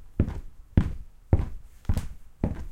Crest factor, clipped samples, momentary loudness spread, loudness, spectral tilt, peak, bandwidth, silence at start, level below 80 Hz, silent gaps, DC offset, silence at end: 24 dB; under 0.1%; 14 LU; -30 LUFS; -8.5 dB/octave; -4 dBFS; 13.5 kHz; 0 s; -34 dBFS; none; under 0.1%; 0 s